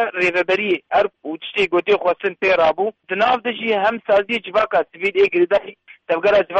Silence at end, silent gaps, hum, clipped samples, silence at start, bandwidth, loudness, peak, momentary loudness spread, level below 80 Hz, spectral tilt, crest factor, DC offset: 0 s; none; none; under 0.1%; 0 s; 8.4 kHz; -18 LUFS; -6 dBFS; 7 LU; -56 dBFS; -5 dB/octave; 12 dB; under 0.1%